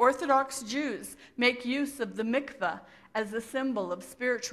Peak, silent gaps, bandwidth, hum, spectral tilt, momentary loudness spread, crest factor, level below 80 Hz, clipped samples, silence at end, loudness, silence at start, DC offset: -10 dBFS; none; 15 kHz; none; -3 dB/octave; 10 LU; 20 dB; -70 dBFS; under 0.1%; 0 s; -31 LUFS; 0 s; under 0.1%